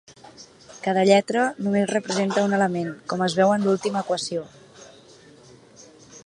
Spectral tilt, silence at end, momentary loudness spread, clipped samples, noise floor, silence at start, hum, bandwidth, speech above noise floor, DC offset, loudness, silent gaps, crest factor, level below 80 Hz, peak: -5 dB/octave; 0.05 s; 12 LU; under 0.1%; -50 dBFS; 0.1 s; none; 11 kHz; 28 dB; under 0.1%; -22 LUFS; none; 20 dB; -68 dBFS; -2 dBFS